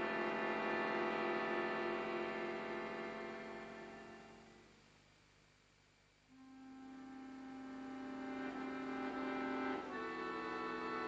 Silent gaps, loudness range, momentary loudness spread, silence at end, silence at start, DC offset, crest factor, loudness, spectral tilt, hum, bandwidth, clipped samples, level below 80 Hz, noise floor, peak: none; 18 LU; 17 LU; 0 s; 0 s; under 0.1%; 18 dB; -43 LUFS; -5.5 dB/octave; 50 Hz at -75 dBFS; 8.6 kHz; under 0.1%; -76 dBFS; -71 dBFS; -26 dBFS